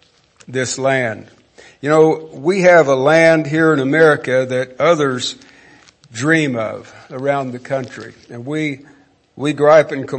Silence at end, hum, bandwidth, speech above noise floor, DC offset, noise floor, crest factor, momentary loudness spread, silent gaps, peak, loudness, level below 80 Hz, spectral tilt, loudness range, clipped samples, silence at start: 0 s; none; 8.8 kHz; 32 dB; under 0.1%; -47 dBFS; 16 dB; 21 LU; none; 0 dBFS; -15 LUFS; -62 dBFS; -5.5 dB/octave; 8 LU; under 0.1%; 0.5 s